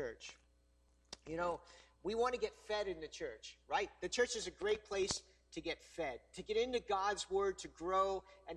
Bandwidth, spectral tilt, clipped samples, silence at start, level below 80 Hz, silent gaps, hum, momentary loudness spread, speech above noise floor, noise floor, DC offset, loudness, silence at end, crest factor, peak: 11.5 kHz; -3 dB/octave; under 0.1%; 0 s; -64 dBFS; none; none; 11 LU; 32 dB; -72 dBFS; under 0.1%; -40 LUFS; 0 s; 20 dB; -20 dBFS